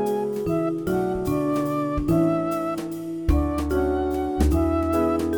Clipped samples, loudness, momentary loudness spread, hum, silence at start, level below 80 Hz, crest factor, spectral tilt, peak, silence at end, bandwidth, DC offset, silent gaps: under 0.1%; -24 LUFS; 5 LU; none; 0 s; -32 dBFS; 14 dB; -8 dB/octave; -8 dBFS; 0 s; over 20 kHz; under 0.1%; none